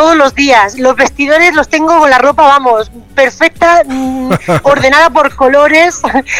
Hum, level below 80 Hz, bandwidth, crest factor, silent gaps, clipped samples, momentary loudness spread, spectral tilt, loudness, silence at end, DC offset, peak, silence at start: none; -36 dBFS; 16.5 kHz; 8 dB; none; 0.6%; 8 LU; -4 dB/octave; -7 LUFS; 0 s; under 0.1%; 0 dBFS; 0 s